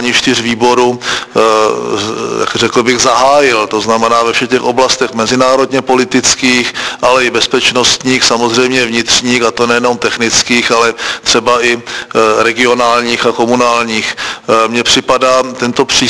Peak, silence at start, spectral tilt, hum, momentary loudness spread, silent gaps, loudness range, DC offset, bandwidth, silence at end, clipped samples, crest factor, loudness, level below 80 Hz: 0 dBFS; 0 s; -2.5 dB/octave; none; 5 LU; none; 1 LU; under 0.1%; 11 kHz; 0 s; 0.6%; 10 dB; -10 LUFS; -44 dBFS